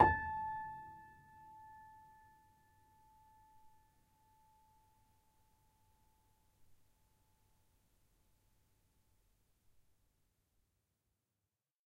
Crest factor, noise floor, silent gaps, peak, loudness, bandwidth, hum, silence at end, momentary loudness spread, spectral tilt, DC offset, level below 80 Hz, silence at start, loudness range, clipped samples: 34 dB; under -90 dBFS; none; -12 dBFS; -39 LUFS; 16 kHz; none; 10.1 s; 22 LU; -7.5 dB/octave; under 0.1%; -64 dBFS; 0 s; 21 LU; under 0.1%